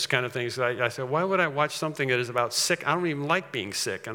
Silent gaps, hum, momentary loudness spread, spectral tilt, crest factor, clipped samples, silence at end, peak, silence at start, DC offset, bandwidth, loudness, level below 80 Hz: none; none; 5 LU; -3.5 dB/octave; 20 dB; under 0.1%; 0 s; -6 dBFS; 0 s; under 0.1%; 18 kHz; -26 LUFS; -78 dBFS